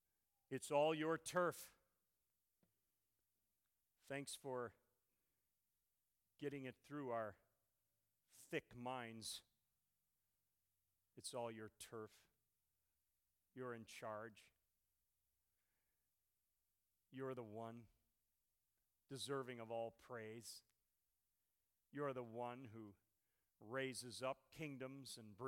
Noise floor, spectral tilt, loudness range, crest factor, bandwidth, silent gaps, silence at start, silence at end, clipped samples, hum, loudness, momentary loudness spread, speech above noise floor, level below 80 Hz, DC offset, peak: under -90 dBFS; -4.5 dB/octave; 8 LU; 26 dB; 17.5 kHz; none; 0.5 s; 0 s; under 0.1%; none; -49 LUFS; 16 LU; over 41 dB; -88 dBFS; under 0.1%; -26 dBFS